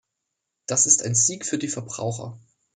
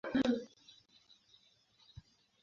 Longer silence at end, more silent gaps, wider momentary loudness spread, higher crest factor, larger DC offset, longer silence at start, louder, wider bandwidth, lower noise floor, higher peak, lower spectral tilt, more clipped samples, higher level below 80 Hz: second, 0.35 s vs 1.95 s; neither; second, 19 LU vs 26 LU; about the same, 22 dB vs 20 dB; neither; first, 0.7 s vs 0.05 s; first, -21 LUFS vs -35 LUFS; first, 10 kHz vs 7.4 kHz; first, -81 dBFS vs -70 dBFS; first, -2 dBFS vs -20 dBFS; about the same, -3 dB/octave vs -4 dB/octave; neither; about the same, -68 dBFS vs -68 dBFS